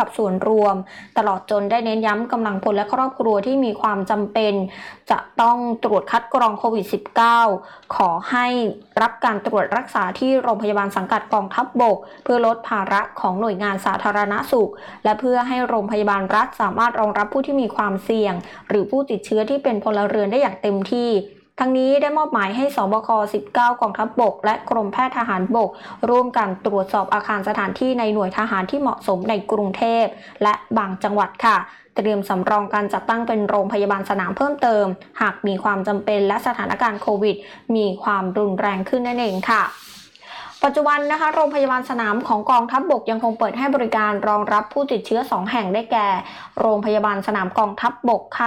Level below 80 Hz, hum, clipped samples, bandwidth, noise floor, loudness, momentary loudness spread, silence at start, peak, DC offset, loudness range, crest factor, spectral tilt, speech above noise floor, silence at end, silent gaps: -62 dBFS; none; under 0.1%; 16.5 kHz; -39 dBFS; -20 LUFS; 5 LU; 0 s; -8 dBFS; under 0.1%; 2 LU; 12 dB; -6 dB/octave; 20 dB; 0 s; none